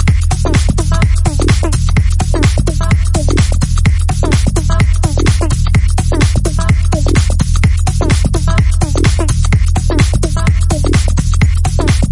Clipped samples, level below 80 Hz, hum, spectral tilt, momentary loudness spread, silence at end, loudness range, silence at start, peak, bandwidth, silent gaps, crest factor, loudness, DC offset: under 0.1%; -14 dBFS; none; -5.5 dB/octave; 1 LU; 0 s; 0 LU; 0 s; 0 dBFS; 11.5 kHz; none; 10 dB; -13 LUFS; 0.4%